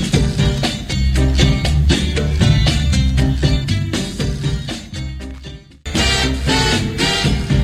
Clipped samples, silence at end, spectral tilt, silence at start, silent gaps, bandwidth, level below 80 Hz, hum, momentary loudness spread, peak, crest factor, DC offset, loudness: under 0.1%; 0 s; -5 dB/octave; 0 s; none; 14 kHz; -20 dBFS; none; 12 LU; 0 dBFS; 16 dB; under 0.1%; -16 LUFS